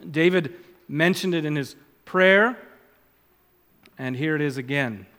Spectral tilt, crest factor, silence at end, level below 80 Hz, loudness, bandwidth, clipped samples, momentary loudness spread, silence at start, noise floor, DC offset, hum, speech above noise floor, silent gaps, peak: -6 dB/octave; 20 dB; 0.15 s; -72 dBFS; -22 LUFS; 17.5 kHz; under 0.1%; 17 LU; 0.05 s; -62 dBFS; under 0.1%; none; 39 dB; none; -4 dBFS